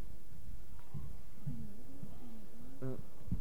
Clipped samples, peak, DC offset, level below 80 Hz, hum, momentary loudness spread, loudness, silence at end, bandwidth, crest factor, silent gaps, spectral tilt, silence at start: under 0.1%; -24 dBFS; 2%; -54 dBFS; none; 10 LU; -50 LUFS; 0 s; 17.5 kHz; 20 dB; none; -8 dB/octave; 0 s